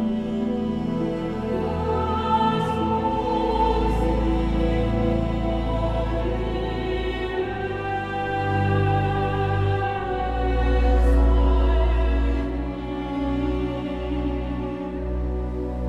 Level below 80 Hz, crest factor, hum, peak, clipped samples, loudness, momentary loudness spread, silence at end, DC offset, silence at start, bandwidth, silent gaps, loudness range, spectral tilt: -26 dBFS; 14 dB; none; -8 dBFS; under 0.1%; -24 LUFS; 7 LU; 0 s; under 0.1%; 0 s; 6 kHz; none; 4 LU; -8 dB/octave